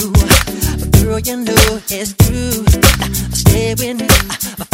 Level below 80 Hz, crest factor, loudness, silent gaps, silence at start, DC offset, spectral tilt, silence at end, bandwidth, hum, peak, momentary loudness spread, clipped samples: -18 dBFS; 12 dB; -13 LUFS; none; 0 s; under 0.1%; -4 dB/octave; 0.1 s; 16.5 kHz; none; 0 dBFS; 8 LU; 0.3%